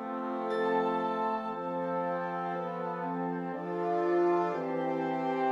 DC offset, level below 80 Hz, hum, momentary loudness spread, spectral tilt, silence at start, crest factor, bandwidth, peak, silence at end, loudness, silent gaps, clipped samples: under 0.1%; -76 dBFS; none; 7 LU; -8 dB/octave; 0 s; 14 dB; 7.4 kHz; -18 dBFS; 0 s; -32 LUFS; none; under 0.1%